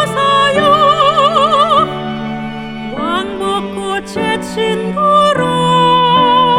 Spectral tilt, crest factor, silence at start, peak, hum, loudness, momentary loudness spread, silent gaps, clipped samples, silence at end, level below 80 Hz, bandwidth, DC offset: -5 dB/octave; 12 dB; 0 s; 0 dBFS; none; -12 LUFS; 11 LU; none; under 0.1%; 0 s; -44 dBFS; 15.5 kHz; under 0.1%